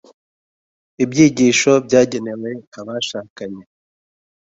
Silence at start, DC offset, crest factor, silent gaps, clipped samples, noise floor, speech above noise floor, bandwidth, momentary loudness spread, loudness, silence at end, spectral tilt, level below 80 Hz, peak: 1 s; under 0.1%; 18 dB; 2.67-2.72 s, 3.30-3.36 s; under 0.1%; under -90 dBFS; over 74 dB; 8 kHz; 19 LU; -16 LUFS; 0.9 s; -4.5 dB/octave; -58 dBFS; 0 dBFS